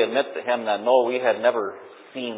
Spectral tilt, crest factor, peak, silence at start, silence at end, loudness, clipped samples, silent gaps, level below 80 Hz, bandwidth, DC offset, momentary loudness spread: -8 dB/octave; 18 dB; -6 dBFS; 0 s; 0 s; -23 LUFS; under 0.1%; none; -82 dBFS; 4 kHz; under 0.1%; 14 LU